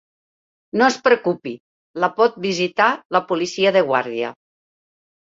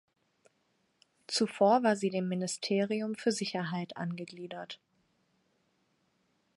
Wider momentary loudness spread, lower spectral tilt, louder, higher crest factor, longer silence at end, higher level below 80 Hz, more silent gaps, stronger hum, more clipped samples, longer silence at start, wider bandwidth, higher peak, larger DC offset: second, 12 LU vs 17 LU; about the same, -4 dB/octave vs -4.5 dB/octave; first, -19 LUFS vs -31 LUFS; about the same, 20 dB vs 20 dB; second, 1 s vs 1.8 s; first, -66 dBFS vs -84 dBFS; first, 1.60-1.94 s, 3.05-3.10 s vs none; neither; neither; second, 0.75 s vs 1.3 s; second, 7.8 kHz vs 11.5 kHz; first, -2 dBFS vs -14 dBFS; neither